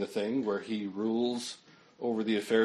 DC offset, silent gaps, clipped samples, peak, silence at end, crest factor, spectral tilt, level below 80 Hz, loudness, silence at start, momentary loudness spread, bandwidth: under 0.1%; none; under 0.1%; -14 dBFS; 0 s; 18 dB; -5 dB/octave; -80 dBFS; -33 LUFS; 0 s; 7 LU; 13 kHz